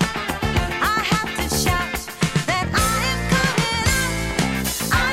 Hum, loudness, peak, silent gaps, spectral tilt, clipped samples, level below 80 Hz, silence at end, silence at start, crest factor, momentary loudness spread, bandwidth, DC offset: none; -20 LUFS; -8 dBFS; none; -3.5 dB/octave; under 0.1%; -32 dBFS; 0 s; 0 s; 14 dB; 4 LU; 16.5 kHz; under 0.1%